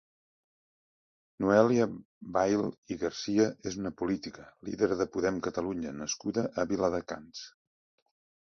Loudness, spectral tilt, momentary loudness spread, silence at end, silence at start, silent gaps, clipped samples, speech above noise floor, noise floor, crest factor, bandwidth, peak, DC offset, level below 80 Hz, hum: -30 LUFS; -5 dB/octave; 15 LU; 1.05 s; 1.4 s; 2.05-2.21 s, 2.78-2.83 s; under 0.1%; over 60 dB; under -90 dBFS; 24 dB; 7.2 kHz; -8 dBFS; under 0.1%; -62 dBFS; none